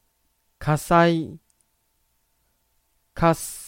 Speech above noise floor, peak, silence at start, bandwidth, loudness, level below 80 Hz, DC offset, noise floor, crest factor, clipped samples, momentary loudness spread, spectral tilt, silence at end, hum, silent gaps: 49 dB; -4 dBFS; 0.6 s; 16.5 kHz; -21 LUFS; -46 dBFS; under 0.1%; -69 dBFS; 22 dB; under 0.1%; 12 LU; -6 dB/octave; 0 s; none; none